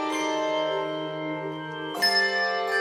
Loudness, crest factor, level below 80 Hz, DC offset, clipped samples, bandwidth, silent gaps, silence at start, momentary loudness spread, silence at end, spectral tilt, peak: -26 LUFS; 16 dB; -82 dBFS; under 0.1%; under 0.1%; 16 kHz; none; 0 s; 11 LU; 0 s; -3 dB/octave; -10 dBFS